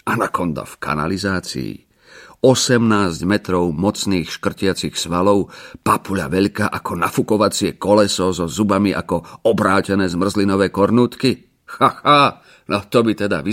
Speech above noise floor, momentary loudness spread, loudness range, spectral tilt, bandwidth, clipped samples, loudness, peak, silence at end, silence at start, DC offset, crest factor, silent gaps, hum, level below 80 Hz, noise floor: 27 dB; 9 LU; 2 LU; -5 dB/octave; 16.5 kHz; under 0.1%; -18 LUFS; 0 dBFS; 0 s; 0.05 s; under 0.1%; 16 dB; none; none; -48 dBFS; -44 dBFS